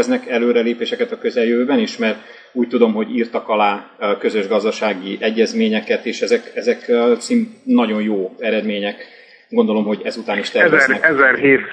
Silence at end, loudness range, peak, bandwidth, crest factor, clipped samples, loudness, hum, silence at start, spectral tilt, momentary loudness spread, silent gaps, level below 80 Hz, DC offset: 0 s; 2 LU; 0 dBFS; 9.8 kHz; 16 dB; under 0.1%; -17 LUFS; none; 0 s; -5 dB/octave; 9 LU; none; -70 dBFS; under 0.1%